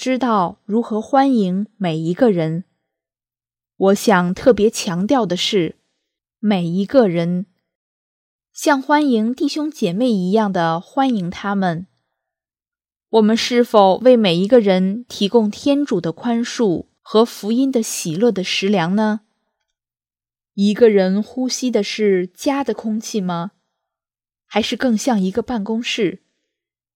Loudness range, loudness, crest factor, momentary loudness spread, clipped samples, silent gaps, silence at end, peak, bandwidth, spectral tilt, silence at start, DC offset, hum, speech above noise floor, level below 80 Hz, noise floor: 6 LU; -17 LUFS; 18 dB; 9 LU; under 0.1%; 7.75-8.39 s; 0.8 s; 0 dBFS; 16.5 kHz; -5.5 dB/octave; 0 s; under 0.1%; none; over 73 dB; -58 dBFS; under -90 dBFS